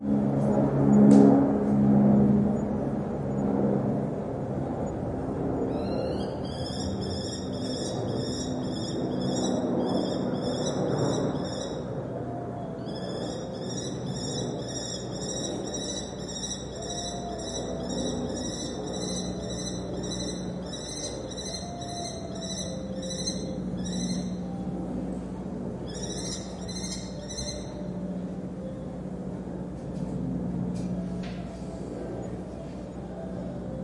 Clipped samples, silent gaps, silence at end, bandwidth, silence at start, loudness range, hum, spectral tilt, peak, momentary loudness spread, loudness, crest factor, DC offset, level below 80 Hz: under 0.1%; none; 0 s; 11.5 kHz; 0 s; 9 LU; none; -6 dB/octave; -6 dBFS; 12 LU; -29 LUFS; 24 dB; under 0.1%; -48 dBFS